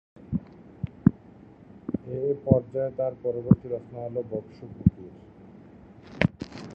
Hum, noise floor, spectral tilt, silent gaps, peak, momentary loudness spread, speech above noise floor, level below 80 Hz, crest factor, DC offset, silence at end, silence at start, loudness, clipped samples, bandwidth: none; -50 dBFS; -9.5 dB/octave; none; -2 dBFS; 17 LU; 24 dB; -46 dBFS; 26 dB; under 0.1%; 0 s; 0.2 s; -28 LUFS; under 0.1%; 7 kHz